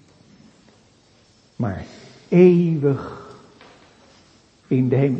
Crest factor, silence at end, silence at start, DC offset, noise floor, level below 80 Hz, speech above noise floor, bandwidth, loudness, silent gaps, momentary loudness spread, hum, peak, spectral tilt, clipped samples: 20 dB; 0 s; 1.6 s; under 0.1%; -55 dBFS; -56 dBFS; 38 dB; 7.6 kHz; -19 LUFS; none; 22 LU; none; -2 dBFS; -9.5 dB/octave; under 0.1%